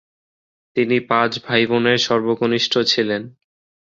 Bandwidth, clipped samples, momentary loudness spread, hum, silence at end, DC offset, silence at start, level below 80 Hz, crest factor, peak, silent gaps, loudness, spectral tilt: 7.6 kHz; under 0.1%; 6 LU; none; 0.65 s; under 0.1%; 0.75 s; -60 dBFS; 18 dB; -2 dBFS; none; -18 LUFS; -4.5 dB/octave